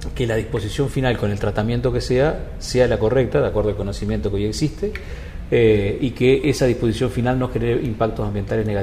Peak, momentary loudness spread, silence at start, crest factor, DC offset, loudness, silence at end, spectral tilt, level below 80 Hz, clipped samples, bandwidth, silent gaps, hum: -4 dBFS; 8 LU; 0 s; 16 dB; under 0.1%; -20 LUFS; 0 s; -6.5 dB/octave; -32 dBFS; under 0.1%; 15 kHz; none; none